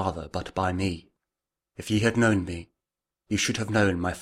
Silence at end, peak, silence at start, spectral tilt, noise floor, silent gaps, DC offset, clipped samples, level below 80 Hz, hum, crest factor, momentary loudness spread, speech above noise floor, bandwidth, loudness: 0 s; -8 dBFS; 0 s; -5 dB/octave; -88 dBFS; none; under 0.1%; under 0.1%; -50 dBFS; none; 18 dB; 14 LU; 63 dB; 15 kHz; -26 LUFS